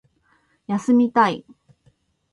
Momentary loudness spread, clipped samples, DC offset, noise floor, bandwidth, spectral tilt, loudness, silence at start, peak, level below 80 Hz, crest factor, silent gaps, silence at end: 12 LU; under 0.1%; under 0.1%; -63 dBFS; 11 kHz; -6 dB/octave; -19 LUFS; 0.7 s; -4 dBFS; -66 dBFS; 18 dB; none; 0.9 s